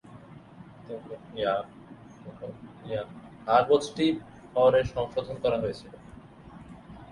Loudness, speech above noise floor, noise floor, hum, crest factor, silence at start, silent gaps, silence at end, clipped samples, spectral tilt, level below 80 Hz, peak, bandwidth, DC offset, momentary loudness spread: -27 LUFS; 22 dB; -49 dBFS; none; 20 dB; 0.05 s; none; 0 s; under 0.1%; -6 dB/octave; -56 dBFS; -8 dBFS; 11.5 kHz; under 0.1%; 26 LU